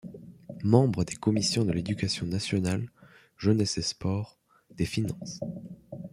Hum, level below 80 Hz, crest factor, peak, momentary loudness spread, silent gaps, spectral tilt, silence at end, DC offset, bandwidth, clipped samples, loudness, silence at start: none; -56 dBFS; 24 dB; -6 dBFS; 19 LU; none; -5.5 dB/octave; 0.05 s; under 0.1%; 14 kHz; under 0.1%; -28 LUFS; 0.05 s